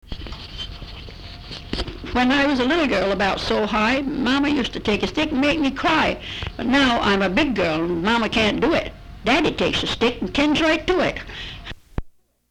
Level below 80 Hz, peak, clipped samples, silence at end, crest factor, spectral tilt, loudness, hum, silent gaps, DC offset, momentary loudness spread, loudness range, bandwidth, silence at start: -38 dBFS; -6 dBFS; under 0.1%; 0.4 s; 14 dB; -5 dB/octave; -20 LUFS; none; none; under 0.1%; 16 LU; 2 LU; 12.5 kHz; 0.1 s